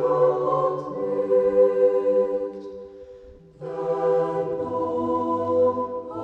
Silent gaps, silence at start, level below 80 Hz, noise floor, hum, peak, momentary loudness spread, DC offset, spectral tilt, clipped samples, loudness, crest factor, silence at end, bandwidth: none; 0 s; -60 dBFS; -46 dBFS; none; -8 dBFS; 15 LU; under 0.1%; -9 dB/octave; under 0.1%; -23 LUFS; 14 dB; 0 s; 4.4 kHz